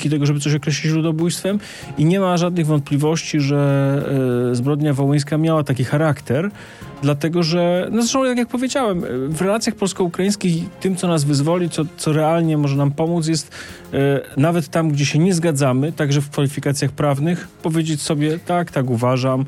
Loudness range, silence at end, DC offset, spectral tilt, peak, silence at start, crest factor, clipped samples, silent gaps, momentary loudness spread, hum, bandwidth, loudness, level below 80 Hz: 2 LU; 0 s; under 0.1%; -6 dB/octave; -6 dBFS; 0 s; 12 dB; under 0.1%; none; 5 LU; none; 13.5 kHz; -19 LUFS; -54 dBFS